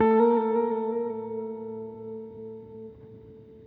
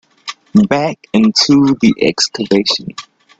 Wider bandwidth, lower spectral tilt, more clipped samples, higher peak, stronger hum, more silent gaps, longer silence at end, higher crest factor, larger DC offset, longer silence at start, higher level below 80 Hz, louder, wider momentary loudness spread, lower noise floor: second, 4 kHz vs 8 kHz; first, -10.5 dB/octave vs -4.5 dB/octave; neither; second, -10 dBFS vs 0 dBFS; neither; neither; second, 0 s vs 0.35 s; about the same, 18 dB vs 14 dB; neither; second, 0 s vs 0.25 s; second, -66 dBFS vs -50 dBFS; second, -27 LUFS vs -12 LUFS; first, 25 LU vs 19 LU; first, -48 dBFS vs -32 dBFS